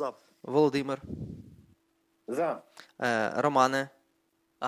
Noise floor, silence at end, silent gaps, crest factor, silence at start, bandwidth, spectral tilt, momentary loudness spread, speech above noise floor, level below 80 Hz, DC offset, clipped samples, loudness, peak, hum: -73 dBFS; 0 s; none; 22 dB; 0 s; 16 kHz; -5.5 dB/octave; 18 LU; 44 dB; -62 dBFS; under 0.1%; under 0.1%; -29 LUFS; -8 dBFS; none